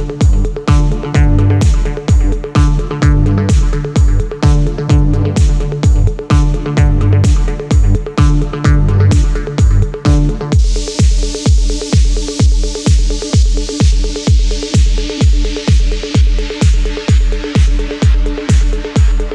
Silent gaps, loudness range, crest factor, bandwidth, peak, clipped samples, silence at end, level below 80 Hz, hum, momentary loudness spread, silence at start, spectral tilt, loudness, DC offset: none; 1 LU; 10 dB; 10 kHz; 0 dBFS; under 0.1%; 0 s; -12 dBFS; none; 4 LU; 0 s; -6 dB/octave; -13 LUFS; under 0.1%